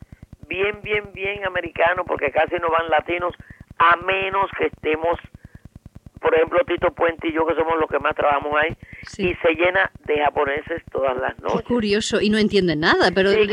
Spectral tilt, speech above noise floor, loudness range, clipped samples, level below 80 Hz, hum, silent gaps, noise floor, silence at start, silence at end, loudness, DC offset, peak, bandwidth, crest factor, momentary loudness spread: -5 dB/octave; 24 dB; 2 LU; under 0.1%; -46 dBFS; none; none; -44 dBFS; 0.5 s; 0 s; -20 LUFS; under 0.1%; -4 dBFS; 11 kHz; 18 dB; 8 LU